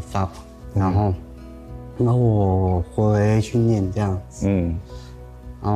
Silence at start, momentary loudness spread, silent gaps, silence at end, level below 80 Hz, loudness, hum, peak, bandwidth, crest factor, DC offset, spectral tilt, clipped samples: 0 s; 21 LU; none; 0 s; -38 dBFS; -21 LUFS; none; -8 dBFS; 10.5 kHz; 12 dB; under 0.1%; -8.5 dB/octave; under 0.1%